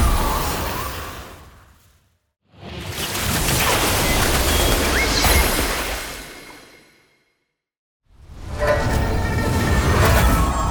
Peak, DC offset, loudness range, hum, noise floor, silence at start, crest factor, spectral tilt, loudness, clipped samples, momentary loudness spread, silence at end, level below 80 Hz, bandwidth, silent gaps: -4 dBFS; under 0.1%; 9 LU; none; -73 dBFS; 0 s; 16 dB; -3.5 dB/octave; -19 LUFS; under 0.1%; 18 LU; 0 s; -26 dBFS; over 20 kHz; 7.78-8.00 s